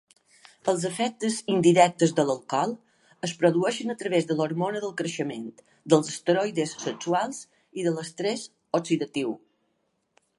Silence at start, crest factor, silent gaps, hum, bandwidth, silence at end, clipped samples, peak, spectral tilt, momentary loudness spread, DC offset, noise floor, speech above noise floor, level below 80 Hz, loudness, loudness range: 0.65 s; 22 dB; none; none; 11.5 kHz; 1 s; under 0.1%; -4 dBFS; -5 dB/octave; 13 LU; under 0.1%; -74 dBFS; 49 dB; -76 dBFS; -26 LUFS; 5 LU